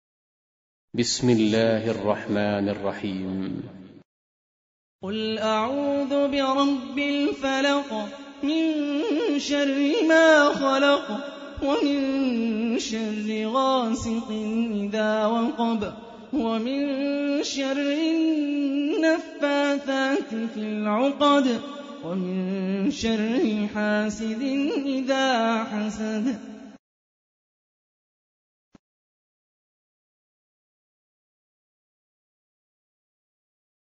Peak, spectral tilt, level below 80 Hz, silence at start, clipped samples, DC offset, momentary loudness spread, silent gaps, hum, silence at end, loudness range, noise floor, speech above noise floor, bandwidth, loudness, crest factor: -6 dBFS; -5 dB/octave; -58 dBFS; 0.95 s; under 0.1%; under 0.1%; 10 LU; 4.05-4.99 s; none; 7.2 s; 7 LU; under -90 dBFS; over 66 dB; 8 kHz; -24 LUFS; 20 dB